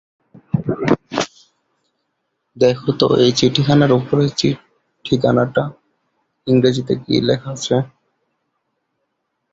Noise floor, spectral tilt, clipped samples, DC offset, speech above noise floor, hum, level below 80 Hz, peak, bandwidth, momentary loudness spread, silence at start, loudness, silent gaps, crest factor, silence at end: -72 dBFS; -6 dB/octave; under 0.1%; under 0.1%; 57 dB; none; -50 dBFS; -2 dBFS; 8 kHz; 10 LU; 0.55 s; -17 LUFS; none; 18 dB; 1.65 s